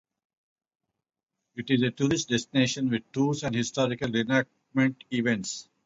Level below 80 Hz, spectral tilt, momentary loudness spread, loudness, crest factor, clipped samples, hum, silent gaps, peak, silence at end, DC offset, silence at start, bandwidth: -62 dBFS; -5 dB/octave; 5 LU; -27 LUFS; 18 dB; under 0.1%; none; none; -10 dBFS; 0.25 s; under 0.1%; 1.55 s; 8 kHz